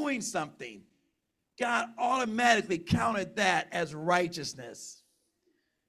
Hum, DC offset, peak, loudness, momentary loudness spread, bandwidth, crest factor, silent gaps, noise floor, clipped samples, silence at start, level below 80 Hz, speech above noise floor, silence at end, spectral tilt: none; under 0.1%; -12 dBFS; -29 LUFS; 18 LU; 14.5 kHz; 20 dB; none; -81 dBFS; under 0.1%; 0 s; -60 dBFS; 50 dB; 0.95 s; -4 dB/octave